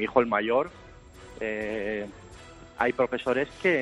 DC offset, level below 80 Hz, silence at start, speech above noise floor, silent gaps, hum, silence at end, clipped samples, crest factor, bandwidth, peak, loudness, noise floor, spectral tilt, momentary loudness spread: under 0.1%; -56 dBFS; 0 s; 21 dB; none; none; 0 s; under 0.1%; 22 dB; 11 kHz; -6 dBFS; -28 LUFS; -48 dBFS; -6 dB/octave; 23 LU